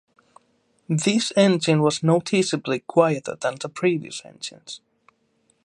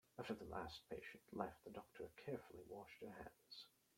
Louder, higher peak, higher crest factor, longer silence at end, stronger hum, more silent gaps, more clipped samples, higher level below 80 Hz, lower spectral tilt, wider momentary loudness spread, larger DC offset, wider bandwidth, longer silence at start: first, -21 LUFS vs -54 LUFS; first, -2 dBFS vs -28 dBFS; second, 20 dB vs 26 dB; first, 0.9 s vs 0.3 s; neither; neither; neither; first, -70 dBFS vs -76 dBFS; about the same, -5 dB/octave vs -5.5 dB/octave; first, 17 LU vs 9 LU; neither; second, 11.5 kHz vs 16.5 kHz; first, 0.9 s vs 0.15 s